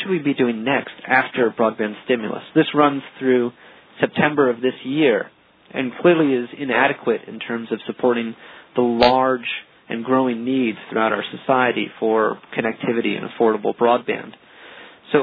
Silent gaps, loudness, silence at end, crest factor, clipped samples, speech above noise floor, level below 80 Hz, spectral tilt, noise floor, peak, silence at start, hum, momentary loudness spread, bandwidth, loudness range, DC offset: none; -20 LUFS; 0 s; 20 dB; under 0.1%; 23 dB; -60 dBFS; -8 dB/octave; -42 dBFS; 0 dBFS; 0 s; none; 10 LU; 5 kHz; 1 LU; under 0.1%